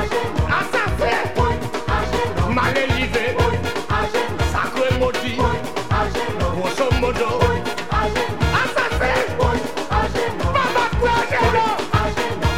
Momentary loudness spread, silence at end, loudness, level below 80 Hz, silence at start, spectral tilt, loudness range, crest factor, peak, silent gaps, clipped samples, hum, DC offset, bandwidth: 4 LU; 0 s; -20 LUFS; -30 dBFS; 0 s; -5.5 dB/octave; 2 LU; 16 dB; -4 dBFS; none; under 0.1%; none; 3%; 16.5 kHz